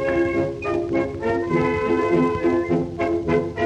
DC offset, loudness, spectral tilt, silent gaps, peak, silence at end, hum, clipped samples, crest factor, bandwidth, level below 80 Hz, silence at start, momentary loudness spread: under 0.1%; -22 LUFS; -8 dB/octave; none; -8 dBFS; 0 s; none; under 0.1%; 14 dB; 8.4 kHz; -44 dBFS; 0 s; 4 LU